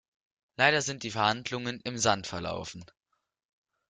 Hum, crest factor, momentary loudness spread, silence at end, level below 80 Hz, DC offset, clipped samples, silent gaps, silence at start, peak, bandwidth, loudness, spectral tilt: none; 24 dB; 16 LU; 1.05 s; -64 dBFS; under 0.1%; under 0.1%; none; 0.6 s; -8 dBFS; 10 kHz; -29 LUFS; -3 dB/octave